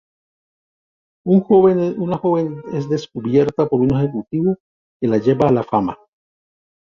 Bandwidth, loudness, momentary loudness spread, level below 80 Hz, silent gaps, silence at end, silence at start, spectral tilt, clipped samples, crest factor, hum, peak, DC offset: 7 kHz; -18 LUFS; 11 LU; -50 dBFS; 4.60-5.00 s; 1 s; 1.25 s; -9 dB/octave; under 0.1%; 16 dB; none; -2 dBFS; under 0.1%